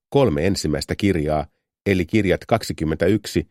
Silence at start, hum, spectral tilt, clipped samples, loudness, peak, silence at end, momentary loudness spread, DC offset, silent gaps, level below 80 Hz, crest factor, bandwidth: 0.1 s; none; -6 dB/octave; under 0.1%; -21 LUFS; -2 dBFS; 0.05 s; 6 LU; under 0.1%; 1.81-1.85 s; -38 dBFS; 18 dB; 16 kHz